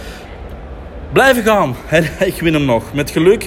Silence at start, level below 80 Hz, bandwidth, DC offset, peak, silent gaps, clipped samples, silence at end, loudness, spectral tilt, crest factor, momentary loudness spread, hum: 0 s; -34 dBFS; 16.5 kHz; under 0.1%; 0 dBFS; none; under 0.1%; 0 s; -14 LUFS; -5.5 dB/octave; 14 dB; 21 LU; none